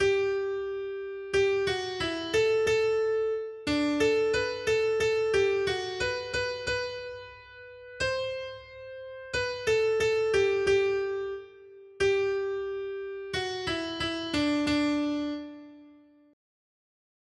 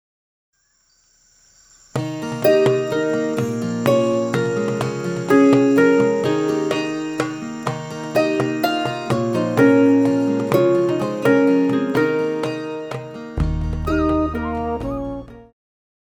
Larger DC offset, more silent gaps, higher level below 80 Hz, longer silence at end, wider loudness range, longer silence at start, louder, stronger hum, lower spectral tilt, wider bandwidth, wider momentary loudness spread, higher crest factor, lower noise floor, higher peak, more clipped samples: neither; neither; second, -56 dBFS vs -36 dBFS; first, 1.4 s vs 0.6 s; about the same, 5 LU vs 6 LU; second, 0 s vs 1.95 s; second, -28 LUFS vs -19 LUFS; neither; second, -4 dB/octave vs -6.5 dB/octave; second, 11.5 kHz vs over 20 kHz; first, 15 LU vs 12 LU; about the same, 14 dB vs 18 dB; second, -56 dBFS vs -62 dBFS; second, -14 dBFS vs -2 dBFS; neither